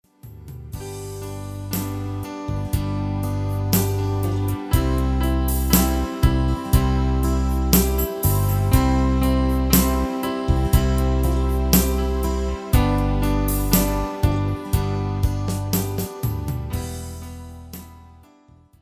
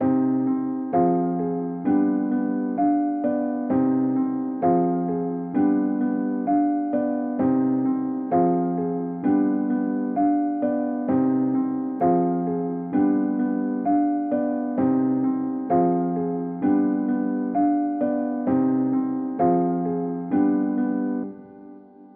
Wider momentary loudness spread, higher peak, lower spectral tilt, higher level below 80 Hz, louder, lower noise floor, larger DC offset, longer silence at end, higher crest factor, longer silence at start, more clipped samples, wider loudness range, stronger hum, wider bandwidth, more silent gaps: first, 14 LU vs 5 LU; first, 0 dBFS vs -8 dBFS; second, -6 dB/octave vs -11 dB/octave; first, -24 dBFS vs -68 dBFS; about the same, -21 LUFS vs -23 LUFS; first, -52 dBFS vs -45 dBFS; neither; first, 0.8 s vs 0.1 s; first, 20 dB vs 14 dB; first, 0.25 s vs 0 s; neither; first, 7 LU vs 1 LU; neither; first, 16 kHz vs 2.6 kHz; neither